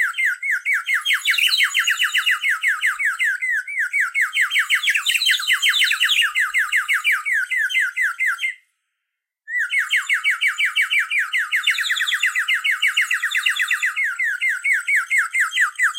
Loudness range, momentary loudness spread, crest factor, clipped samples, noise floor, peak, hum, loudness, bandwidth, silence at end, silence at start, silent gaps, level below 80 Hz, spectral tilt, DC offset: 4 LU; 4 LU; 16 dB; under 0.1%; -80 dBFS; -4 dBFS; none; -18 LUFS; 16 kHz; 0 s; 0 s; none; -76 dBFS; 10.5 dB/octave; under 0.1%